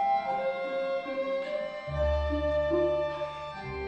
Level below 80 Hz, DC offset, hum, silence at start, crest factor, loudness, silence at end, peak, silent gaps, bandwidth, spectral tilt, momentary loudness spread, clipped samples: -40 dBFS; under 0.1%; none; 0 s; 14 dB; -31 LUFS; 0 s; -16 dBFS; none; 8.4 kHz; -7.5 dB/octave; 8 LU; under 0.1%